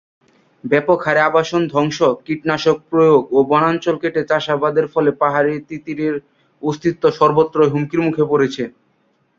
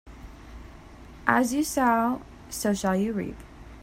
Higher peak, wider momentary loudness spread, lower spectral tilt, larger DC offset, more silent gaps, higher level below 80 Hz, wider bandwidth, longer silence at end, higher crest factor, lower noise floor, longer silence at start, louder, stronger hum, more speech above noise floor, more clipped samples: about the same, -2 dBFS vs -2 dBFS; second, 9 LU vs 23 LU; first, -6.5 dB/octave vs -4.5 dB/octave; neither; neither; second, -58 dBFS vs -48 dBFS; second, 7.4 kHz vs 16 kHz; first, 0.7 s vs 0 s; second, 16 dB vs 26 dB; first, -61 dBFS vs -46 dBFS; first, 0.65 s vs 0.05 s; first, -16 LUFS vs -26 LUFS; neither; first, 45 dB vs 21 dB; neither